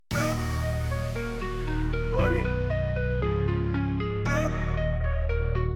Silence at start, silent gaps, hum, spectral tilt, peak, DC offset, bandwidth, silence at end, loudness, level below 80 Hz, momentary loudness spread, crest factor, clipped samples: 0.1 s; none; none; -7 dB/octave; -10 dBFS; under 0.1%; 18.5 kHz; 0 s; -28 LUFS; -32 dBFS; 4 LU; 16 dB; under 0.1%